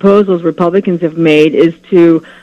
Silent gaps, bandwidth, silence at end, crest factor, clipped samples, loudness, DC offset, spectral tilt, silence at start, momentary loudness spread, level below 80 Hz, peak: none; 8 kHz; 0.2 s; 10 dB; 1%; -10 LUFS; under 0.1%; -8 dB/octave; 0.05 s; 5 LU; -54 dBFS; 0 dBFS